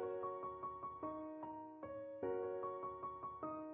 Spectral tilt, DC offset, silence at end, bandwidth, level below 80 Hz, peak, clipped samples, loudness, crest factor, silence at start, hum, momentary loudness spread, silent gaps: -3 dB/octave; under 0.1%; 0 s; 3.6 kHz; -76 dBFS; -30 dBFS; under 0.1%; -47 LUFS; 16 dB; 0 s; none; 7 LU; none